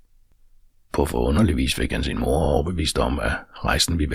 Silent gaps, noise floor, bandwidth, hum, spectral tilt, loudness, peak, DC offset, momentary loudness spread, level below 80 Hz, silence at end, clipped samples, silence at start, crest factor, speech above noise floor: none; -54 dBFS; 16 kHz; none; -5 dB/octave; -22 LUFS; -4 dBFS; under 0.1%; 6 LU; -30 dBFS; 0 s; under 0.1%; 0.95 s; 18 dB; 33 dB